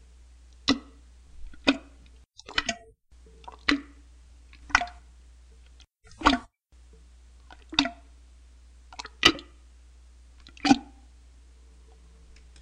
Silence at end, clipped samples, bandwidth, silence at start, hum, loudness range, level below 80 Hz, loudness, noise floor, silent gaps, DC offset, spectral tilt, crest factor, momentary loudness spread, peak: 1.8 s; under 0.1%; 12.5 kHz; 0.7 s; none; 4 LU; -48 dBFS; -26 LUFS; -55 dBFS; none; under 0.1%; -2.5 dB/octave; 32 dB; 21 LU; 0 dBFS